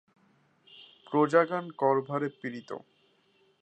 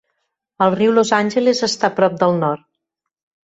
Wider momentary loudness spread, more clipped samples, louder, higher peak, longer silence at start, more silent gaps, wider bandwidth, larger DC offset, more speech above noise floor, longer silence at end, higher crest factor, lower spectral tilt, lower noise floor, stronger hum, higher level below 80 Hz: first, 19 LU vs 6 LU; neither; second, -28 LUFS vs -16 LUFS; second, -8 dBFS vs -2 dBFS; first, 0.75 s vs 0.6 s; neither; about the same, 8.8 kHz vs 8.2 kHz; neither; second, 39 dB vs 63 dB; about the same, 0.8 s vs 0.9 s; first, 22 dB vs 16 dB; first, -7 dB/octave vs -5 dB/octave; second, -68 dBFS vs -79 dBFS; neither; second, -84 dBFS vs -62 dBFS